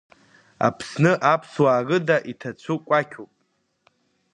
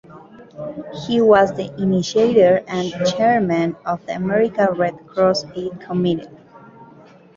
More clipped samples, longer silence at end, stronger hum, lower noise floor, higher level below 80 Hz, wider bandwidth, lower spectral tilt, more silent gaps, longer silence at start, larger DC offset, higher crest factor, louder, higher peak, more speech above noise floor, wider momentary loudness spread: neither; first, 1.1 s vs 0.5 s; neither; first, -70 dBFS vs -45 dBFS; second, -66 dBFS vs -56 dBFS; first, 10.5 kHz vs 7.6 kHz; about the same, -6.5 dB/octave vs -6 dB/octave; neither; first, 0.6 s vs 0.1 s; neither; about the same, 20 dB vs 18 dB; second, -21 LUFS vs -18 LUFS; about the same, -4 dBFS vs -2 dBFS; first, 49 dB vs 28 dB; about the same, 15 LU vs 15 LU